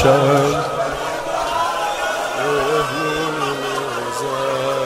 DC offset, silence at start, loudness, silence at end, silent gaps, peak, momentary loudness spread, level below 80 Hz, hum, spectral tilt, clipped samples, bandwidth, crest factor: under 0.1%; 0 s; -19 LUFS; 0 s; none; 0 dBFS; 7 LU; -44 dBFS; none; -4.5 dB/octave; under 0.1%; 16 kHz; 18 dB